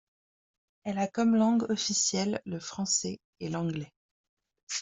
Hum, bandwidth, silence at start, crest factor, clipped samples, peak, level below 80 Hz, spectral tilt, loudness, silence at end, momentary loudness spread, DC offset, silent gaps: none; 8.2 kHz; 0.85 s; 18 dB; under 0.1%; -14 dBFS; -70 dBFS; -3.5 dB/octave; -29 LUFS; 0 s; 14 LU; under 0.1%; 3.24-3.33 s, 3.96-4.37 s, 4.63-4.67 s